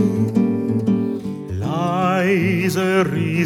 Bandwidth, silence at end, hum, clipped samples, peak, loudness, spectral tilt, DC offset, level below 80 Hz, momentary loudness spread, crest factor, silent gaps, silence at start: 16 kHz; 0 s; none; under 0.1%; -6 dBFS; -19 LUFS; -7 dB/octave; under 0.1%; -52 dBFS; 7 LU; 14 dB; none; 0 s